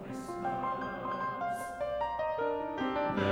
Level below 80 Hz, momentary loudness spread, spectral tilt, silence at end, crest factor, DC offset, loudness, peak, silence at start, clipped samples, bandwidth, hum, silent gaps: -60 dBFS; 4 LU; -6 dB/octave; 0 s; 16 dB; under 0.1%; -35 LUFS; -18 dBFS; 0 s; under 0.1%; over 20 kHz; none; none